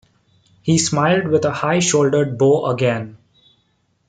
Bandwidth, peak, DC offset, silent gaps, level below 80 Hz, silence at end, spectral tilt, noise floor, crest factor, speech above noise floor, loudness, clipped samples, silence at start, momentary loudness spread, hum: 9.6 kHz; -4 dBFS; under 0.1%; none; -58 dBFS; 0.95 s; -5 dB/octave; -64 dBFS; 14 dB; 47 dB; -17 LUFS; under 0.1%; 0.65 s; 7 LU; none